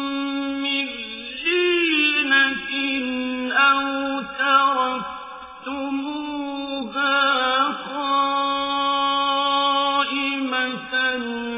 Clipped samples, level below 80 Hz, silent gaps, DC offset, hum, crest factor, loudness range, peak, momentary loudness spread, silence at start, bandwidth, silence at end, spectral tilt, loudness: under 0.1%; -60 dBFS; none; under 0.1%; none; 16 dB; 4 LU; -6 dBFS; 11 LU; 0 s; 3.9 kHz; 0 s; -6 dB/octave; -21 LUFS